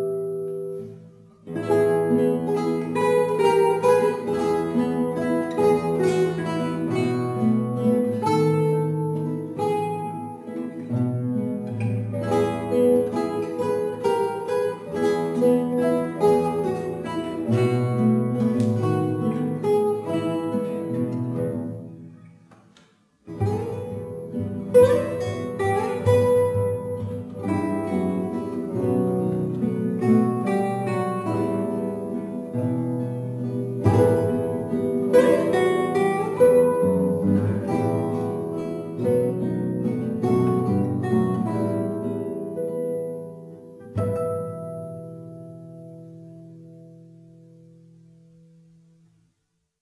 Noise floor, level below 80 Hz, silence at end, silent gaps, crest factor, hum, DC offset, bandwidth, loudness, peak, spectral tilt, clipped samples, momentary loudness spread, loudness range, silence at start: -75 dBFS; -58 dBFS; 2.8 s; none; 20 dB; none; under 0.1%; 11 kHz; -23 LUFS; -4 dBFS; -8 dB/octave; under 0.1%; 13 LU; 9 LU; 0 s